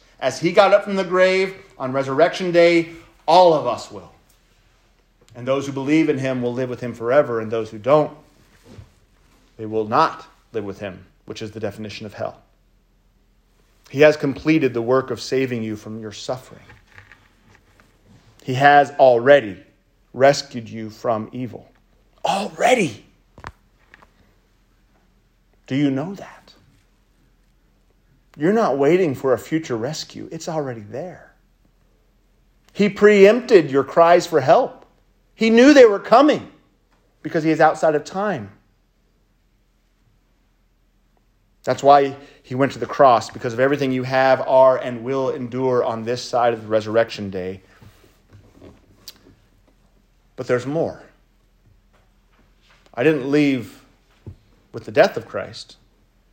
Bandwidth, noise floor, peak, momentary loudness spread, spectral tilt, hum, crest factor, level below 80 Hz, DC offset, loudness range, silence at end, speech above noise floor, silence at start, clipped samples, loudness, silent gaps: 16 kHz; -61 dBFS; 0 dBFS; 19 LU; -5.5 dB/octave; none; 20 dB; -58 dBFS; under 0.1%; 13 LU; 0.7 s; 43 dB; 0.2 s; under 0.1%; -18 LUFS; none